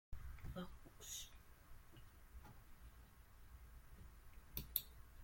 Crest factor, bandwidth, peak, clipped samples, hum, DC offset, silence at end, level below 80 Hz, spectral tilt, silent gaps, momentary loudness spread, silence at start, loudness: 36 dB; 16.5 kHz; -20 dBFS; under 0.1%; none; under 0.1%; 0 s; -60 dBFS; -3.5 dB/octave; none; 21 LU; 0.1 s; -52 LUFS